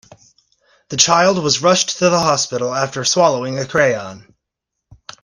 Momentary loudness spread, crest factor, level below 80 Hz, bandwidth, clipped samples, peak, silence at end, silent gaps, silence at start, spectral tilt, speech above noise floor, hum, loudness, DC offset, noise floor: 8 LU; 18 dB; -56 dBFS; 11 kHz; under 0.1%; 0 dBFS; 1 s; none; 0.9 s; -3 dB/octave; 64 dB; none; -15 LUFS; under 0.1%; -79 dBFS